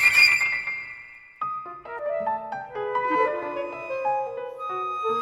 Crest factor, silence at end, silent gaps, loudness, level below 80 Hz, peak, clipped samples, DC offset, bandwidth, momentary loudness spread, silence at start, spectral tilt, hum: 20 dB; 0 s; none; -25 LUFS; -64 dBFS; -6 dBFS; under 0.1%; under 0.1%; 16.5 kHz; 16 LU; 0 s; -1.5 dB/octave; none